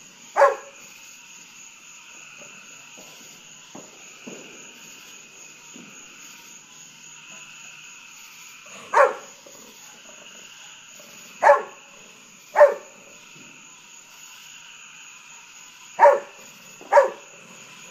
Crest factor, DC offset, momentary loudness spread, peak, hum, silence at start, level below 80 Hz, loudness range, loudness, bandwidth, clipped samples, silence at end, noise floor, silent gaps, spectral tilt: 24 dB; under 0.1%; 25 LU; -2 dBFS; none; 0.35 s; -78 dBFS; 18 LU; -19 LUFS; 15.5 kHz; under 0.1%; 0.75 s; -48 dBFS; none; -1.5 dB/octave